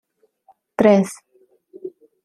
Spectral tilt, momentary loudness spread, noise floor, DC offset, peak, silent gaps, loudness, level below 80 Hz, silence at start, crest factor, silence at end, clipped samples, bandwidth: -6.5 dB/octave; 23 LU; -58 dBFS; under 0.1%; -2 dBFS; none; -17 LUFS; -60 dBFS; 0.8 s; 20 dB; 0.35 s; under 0.1%; 12.5 kHz